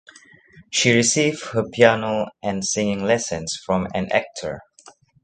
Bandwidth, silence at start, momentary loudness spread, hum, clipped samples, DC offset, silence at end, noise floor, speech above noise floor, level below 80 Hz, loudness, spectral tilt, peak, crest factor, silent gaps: 9.6 kHz; 0.55 s; 11 LU; none; under 0.1%; under 0.1%; 0.6 s; -50 dBFS; 30 dB; -52 dBFS; -20 LUFS; -3.5 dB/octave; 0 dBFS; 22 dB; none